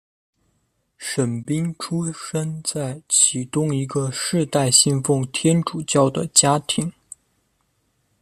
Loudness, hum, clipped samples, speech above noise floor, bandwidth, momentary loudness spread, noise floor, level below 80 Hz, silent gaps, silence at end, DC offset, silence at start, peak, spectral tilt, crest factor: -20 LUFS; none; under 0.1%; 48 dB; 14 kHz; 11 LU; -69 dBFS; -60 dBFS; none; 1.3 s; under 0.1%; 1 s; 0 dBFS; -4 dB/octave; 22 dB